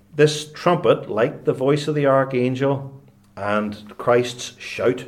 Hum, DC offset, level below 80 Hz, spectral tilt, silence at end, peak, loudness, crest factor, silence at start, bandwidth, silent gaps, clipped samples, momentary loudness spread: none; under 0.1%; -62 dBFS; -6 dB/octave; 0 s; -4 dBFS; -21 LUFS; 16 dB; 0.15 s; 14 kHz; none; under 0.1%; 11 LU